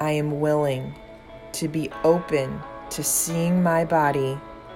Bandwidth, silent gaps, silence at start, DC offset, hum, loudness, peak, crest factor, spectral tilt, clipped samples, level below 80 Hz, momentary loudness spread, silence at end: 16.5 kHz; none; 0 s; under 0.1%; none; -23 LUFS; -6 dBFS; 16 dB; -5 dB/octave; under 0.1%; -52 dBFS; 15 LU; 0 s